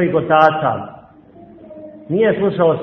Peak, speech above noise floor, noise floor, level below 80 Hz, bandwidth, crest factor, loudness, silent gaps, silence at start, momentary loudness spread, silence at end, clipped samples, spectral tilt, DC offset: 0 dBFS; 28 dB; -43 dBFS; -54 dBFS; 6.2 kHz; 16 dB; -15 LUFS; none; 0 s; 24 LU; 0 s; under 0.1%; -8.5 dB/octave; under 0.1%